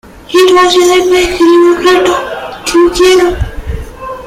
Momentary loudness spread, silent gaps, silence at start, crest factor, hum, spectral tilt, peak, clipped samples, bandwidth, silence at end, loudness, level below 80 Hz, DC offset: 15 LU; none; 0.3 s; 8 dB; none; -4 dB/octave; 0 dBFS; under 0.1%; 15.5 kHz; 0 s; -7 LUFS; -26 dBFS; under 0.1%